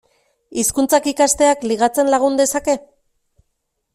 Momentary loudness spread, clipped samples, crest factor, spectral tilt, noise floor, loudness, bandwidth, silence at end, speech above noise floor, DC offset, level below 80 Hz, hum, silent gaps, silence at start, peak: 7 LU; under 0.1%; 16 dB; -2.5 dB/octave; -72 dBFS; -16 LUFS; 16 kHz; 1.15 s; 56 dB; under 0.1%; -50 dBFS; none; none; 0.5 s; -2 dBFS